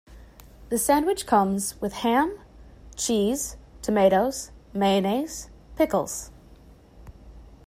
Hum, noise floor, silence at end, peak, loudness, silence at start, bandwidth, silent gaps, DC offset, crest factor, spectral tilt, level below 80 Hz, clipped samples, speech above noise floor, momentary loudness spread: none; -50 dBFS; 0.1 s; -6 dBFS; -24 LUFS; 0.1 s; 16 kHz; none; under 0.1%; 20 dB; -4.5 dB/octave; -48 dBFS; under 0.1%; 27 dB; 14 LU